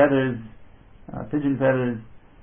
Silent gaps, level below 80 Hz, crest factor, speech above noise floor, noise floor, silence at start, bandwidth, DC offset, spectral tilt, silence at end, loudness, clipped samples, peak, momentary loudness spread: none; -52 dBFS; 18 dB; 24 dB; -47 dBFS; 0 s; 3.6 kHz; under 0.1%; -12 dB/octave; 0.25 s; -24 LUFS; under 0.1%; -6 dBFS; 17 LU